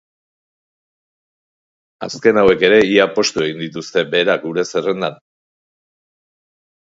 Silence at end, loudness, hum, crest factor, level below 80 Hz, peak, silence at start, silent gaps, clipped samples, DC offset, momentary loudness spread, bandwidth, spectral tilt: 1.7 s; -15 LUFS; none; 18 dB; -54 dBFS; 0 dBFS; 2 s; none; under 0.1%; under 0.1%; 13 LU; 7.8 kHz; -4 dB/octave